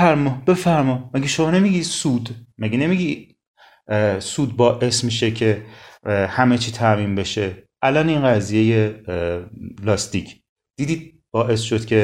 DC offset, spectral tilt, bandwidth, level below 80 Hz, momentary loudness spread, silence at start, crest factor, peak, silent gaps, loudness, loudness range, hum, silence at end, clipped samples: under 0.1%; -5.5 dB/octave; 13 kHz; -50 dBFS; 11 LU; 0 s; 18 dB; 0 dBFS; 3.47-3.54 s, 10.49-10.56 s; -20 LUFS; 3 LU; none; 0 s; under 0.1%